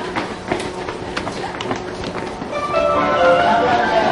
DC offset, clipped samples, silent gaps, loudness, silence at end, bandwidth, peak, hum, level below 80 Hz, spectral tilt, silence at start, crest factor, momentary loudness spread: under 0.1%; under 0.1%; none; -19 LUFS; 0 s; 11.5 kHz; -2 dBFS; none; -42 dBFS; -5 dB/octave; 0 s; 16 dB; 12 LU